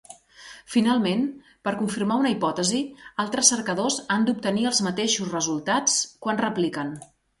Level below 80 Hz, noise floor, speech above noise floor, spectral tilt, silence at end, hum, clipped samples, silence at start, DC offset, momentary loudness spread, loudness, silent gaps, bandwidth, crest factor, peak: -64 dBFS; -47 dBFS; 23 dB; -3 dB/octave; 0.35 s; none; under 0.1%; 0.1 s; under 0.1%; 12 LU; -24 LUFS; none; 11.5 kHz; 22 dB; -2 dBFS